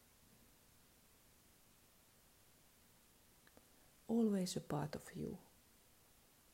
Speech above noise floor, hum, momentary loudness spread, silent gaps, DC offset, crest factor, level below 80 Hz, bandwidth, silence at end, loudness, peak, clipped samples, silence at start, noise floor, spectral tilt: 29 dB; none; 30 LU; none; under 0.1%; 20 dB; -74 dBFS; 16 kHz; 1.15 s; -42 LUFS; -28 dBFS; under 0.1%; 4.1 s; -70 dBFS; -6 dB/octave